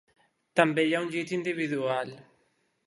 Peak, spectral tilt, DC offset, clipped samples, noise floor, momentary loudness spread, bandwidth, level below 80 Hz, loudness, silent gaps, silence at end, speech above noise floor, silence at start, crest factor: -4 dBFS; -5.5 dB/octave; under 0.1%; under 0.1%; -72 dBFS; 7 LU; 11.5 kHz; -78 dBFS; -28 LUFS; none; 0.65 s; 44 dB; 0.55 s; 24 dB